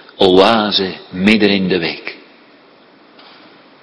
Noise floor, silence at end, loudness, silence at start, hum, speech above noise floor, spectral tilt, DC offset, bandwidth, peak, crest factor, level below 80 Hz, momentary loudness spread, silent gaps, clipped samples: -46 dBFS; 1.65 s; -13 LUFS; 0.2 s; none; 33 dB; -6 dB/octave; under 0.1%; 11 kHz; 0 dBFS; 16 dB; -50 dBFS; 13 LU; none; 0.2%